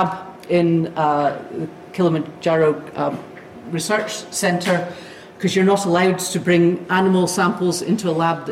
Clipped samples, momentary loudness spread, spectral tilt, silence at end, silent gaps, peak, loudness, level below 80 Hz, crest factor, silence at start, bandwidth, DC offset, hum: under 0.1%; 13 LU; -5 dB/octave; 0 s; none; -6 dBFS; -19 LUFS; -60 dBFS; 14 dB; 0 s; 15.5 kHz; under 0.1%; none